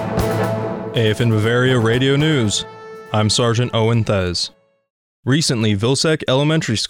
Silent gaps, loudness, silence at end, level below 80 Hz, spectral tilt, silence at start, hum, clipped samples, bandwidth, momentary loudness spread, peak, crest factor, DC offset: 4.90-5.23 s; -17 LUFS; 0 s; -42 dBFS; -5 dB/octave; 0 s; none; under 0.1%; 20 kHz; 7 LU; -6 dBFS; 12 dB; under 0.1%